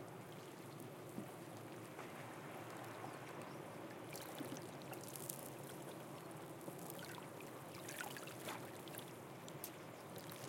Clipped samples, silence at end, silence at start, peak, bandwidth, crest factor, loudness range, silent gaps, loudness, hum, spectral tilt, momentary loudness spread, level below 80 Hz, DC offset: under 0.1%; 0 s; 0 s; -20 dBFS; 17 kHz; 32 dB; 2 LU; none; -51 LUFS; none; -4 dB/octave; 5 LU; -88 dBFS; under 0.1%